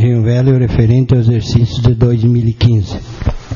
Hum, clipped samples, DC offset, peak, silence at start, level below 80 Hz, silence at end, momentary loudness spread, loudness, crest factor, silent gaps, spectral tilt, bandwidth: none; 0.2%; under 0.1%; 0 dBFS; 0 s; -26 dBFS; 0 s; 9 LU; -12 LUFS; 10 dB; none; -8.5 dB/octave; 7.2 kHz